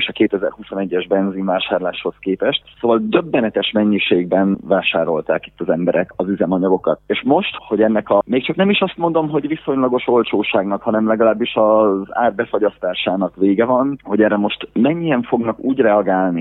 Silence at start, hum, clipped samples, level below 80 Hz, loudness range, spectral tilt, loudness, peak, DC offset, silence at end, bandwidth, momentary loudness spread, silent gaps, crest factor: 0 s; none; under 0.1%; -54 dBFS; 2 LU; -9.5 dB/octave; -17 LUFS; 0 dBFS; under 0.1%; 0 s; 4.1 kHz; 6 LU; none; 16 dB